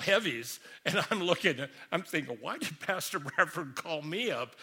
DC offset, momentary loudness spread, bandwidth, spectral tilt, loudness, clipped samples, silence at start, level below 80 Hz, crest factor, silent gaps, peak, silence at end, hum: under 0.1%; 10 LU; 17.5 kHz; -3.5 dB/octave; -32 LUFS; under 0.1%; 0 s; -76 dBFS; 24 dB; none; -10 dBFS; 0 s; none